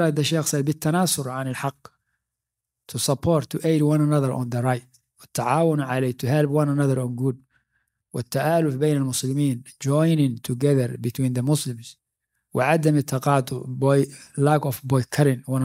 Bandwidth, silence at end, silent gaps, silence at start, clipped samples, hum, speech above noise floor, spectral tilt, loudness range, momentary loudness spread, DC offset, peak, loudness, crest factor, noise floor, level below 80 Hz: 16 kHz; 0 s; none; 0 s; under 0.1%; none; 63 dB; -6 dB/octave; 2 LU; 9 LU; under 0.1%; -4 dBFS; -23 LUFS; 18 dB; -85 dBFS; -60 dBFS